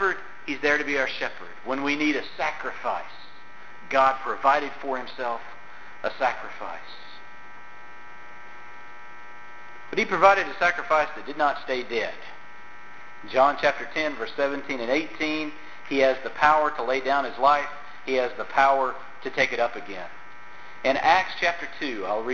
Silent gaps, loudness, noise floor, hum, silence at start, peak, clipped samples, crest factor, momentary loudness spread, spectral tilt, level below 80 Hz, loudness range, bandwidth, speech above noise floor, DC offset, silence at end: none; -25 LUFS; -47 dBFS; none; 0 s; -4 dBFS; under 0.1%; 22 dB; 23 LU; -3.5 dB/octave; -60 dBFS; 10 LU; 7.4 kHz; 22 dB; 2%; 0 s